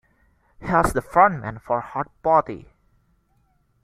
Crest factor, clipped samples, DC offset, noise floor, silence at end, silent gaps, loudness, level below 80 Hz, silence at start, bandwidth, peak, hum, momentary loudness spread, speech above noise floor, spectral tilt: 22 dB; under 0.1%; under 0.1%; -64 dBFS; 1.25 s; none; -21 LUFS; -44 dBFS; 0.6 s; 16 kHz; -2 dBFS; none; 17 LU; 43 dB; -6.5 dB/octave